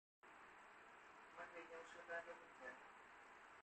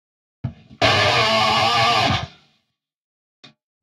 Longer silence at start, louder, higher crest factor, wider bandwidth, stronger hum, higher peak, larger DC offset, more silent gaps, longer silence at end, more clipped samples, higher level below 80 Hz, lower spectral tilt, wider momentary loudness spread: second, 0.25 s vs 0.45 s; second, -58 LUFS vs -17 LUFS; about the same, 20 dB vs 18 dB; second, 8.4 kHz vs 16 kHz; neither; second, -40 dBFS vs -4 dBFS; neither; neither; second, 0 s vs 1.55 s; neither; second, -90 dBFS vs -48 dBFS; about the same, -3 dB/octave vs -3.5 dB/octave; second, 11 LU vs 18 LU